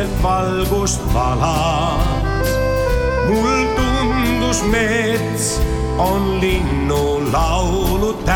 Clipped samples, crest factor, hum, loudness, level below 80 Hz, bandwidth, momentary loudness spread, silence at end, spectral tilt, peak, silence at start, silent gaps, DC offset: under 0.1%; 12 dB; none; -17 LUFS; -22 dBFS; 18 kHz; 2 LU; 0 s; -5 dB/octave; -4 dBFS; 0 s; none; under 0.1%